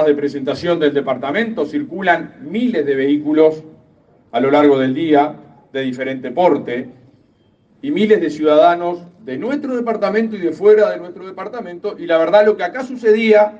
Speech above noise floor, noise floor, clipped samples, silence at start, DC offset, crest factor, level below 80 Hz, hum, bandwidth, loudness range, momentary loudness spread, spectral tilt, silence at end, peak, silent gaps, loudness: 40 dB; -55 dBFS; under 0.1%; 0 s; under 0.1%; 16 dB; -64 dBFS; none; 7.6 kHz; 3 LU; 15 LU; -7 dB/octave; 0 s; 0 dBFS; none; -16 LUFS